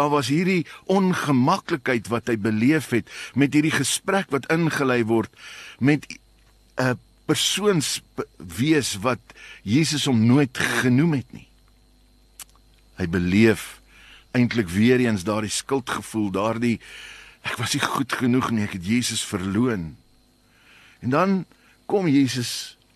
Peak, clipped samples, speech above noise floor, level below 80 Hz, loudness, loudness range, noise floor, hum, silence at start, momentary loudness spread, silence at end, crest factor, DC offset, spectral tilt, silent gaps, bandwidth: -4 dBFS; under 0.1%; 36 dB; -54 dBFS; -22 LUFS; 3 LU; -58 dBFS; none; 0 s; 14 LU; 0.25 s; 18 dB; under 0.1%; -5 dB/octave; none; 13 kHz